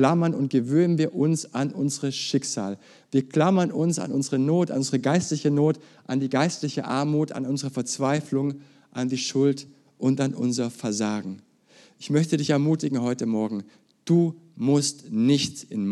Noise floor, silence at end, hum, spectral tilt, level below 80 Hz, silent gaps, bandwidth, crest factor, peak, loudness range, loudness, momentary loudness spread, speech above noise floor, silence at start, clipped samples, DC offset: -56 dBFS; 0 s; none; -5.5 dB/octave; -76 dBFS; none; 12.5 kHz; 18 dB; -6 dBFS; 3 LU; -25 LUFS; 9 LU; 32 dB; 0 s; under 0.1%; under 0.1%